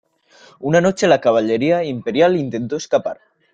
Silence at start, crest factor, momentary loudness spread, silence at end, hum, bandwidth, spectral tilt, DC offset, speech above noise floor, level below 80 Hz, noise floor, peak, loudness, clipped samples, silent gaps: 0.6 s; 16 dB; 10 LU; 0.4 s; none; 8.8 kHz; -5.5 dB/octave; under 0.1%; 33 dB; -58 dBFS; -49 dBFS; -2 dBFS; -17 LUFS; under 0.1%; none